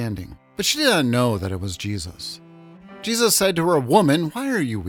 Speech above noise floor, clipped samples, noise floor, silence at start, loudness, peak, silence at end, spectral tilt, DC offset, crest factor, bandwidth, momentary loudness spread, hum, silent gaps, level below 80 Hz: 23 dB; under 0.1%; -44 dBFS; 0 s; -20 LUFS; -2 dBFS; 0 s; -4 dB/octave; under 0.1%; 18 dB; over 20 kHz; 16 LU; none; none; -52 dBFS